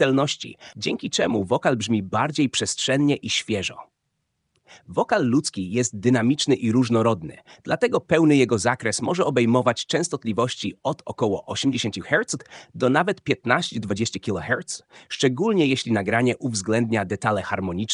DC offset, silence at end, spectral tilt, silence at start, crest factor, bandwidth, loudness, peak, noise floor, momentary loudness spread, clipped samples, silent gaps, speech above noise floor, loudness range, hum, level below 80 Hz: under 0.1%; 0 s; -4.5 dB/octave; 0 s; 22 dB; 10.5 kHz; -23 LUFS; 0 dBFS; -76 dBFS; 9 LU; under 0.1%; none; 53 dB; 3 LU; none; -60 dBFS